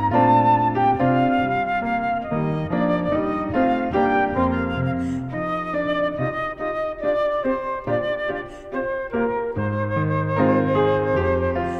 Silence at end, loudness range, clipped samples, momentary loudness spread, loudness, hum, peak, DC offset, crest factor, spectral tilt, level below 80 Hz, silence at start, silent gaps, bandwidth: 0 s; 3 LU; under 0.1%; 7 LU; -22 LUFS; none; -6 dBFS; under 0.1%; 16 dB; -8.5 dB/octave; -44 dBFS; 0 s; none; 8 kHz